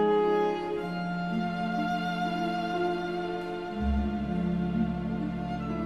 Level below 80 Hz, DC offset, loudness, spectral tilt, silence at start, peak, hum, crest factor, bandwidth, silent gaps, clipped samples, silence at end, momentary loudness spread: -42 dBFS; 0.1%; -30 LUFS; -7.5 dB/octave; 0 s; -16 dBFS; none; 14 dB; 11 kHz; none; under 0.1%; 0 s; 6 LU